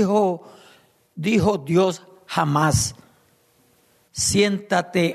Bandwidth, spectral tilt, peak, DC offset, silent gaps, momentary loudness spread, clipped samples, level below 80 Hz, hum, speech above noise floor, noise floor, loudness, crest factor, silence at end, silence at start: 13.5 kHz; -4.5 dB/octave; -6 dBFS; under 0.1%; none; 12 LU; under 0.1%; -48 dBFS; none; 40 dB; -60 dBFS; -21 LUFS; 16 dB; 0 s; 0 s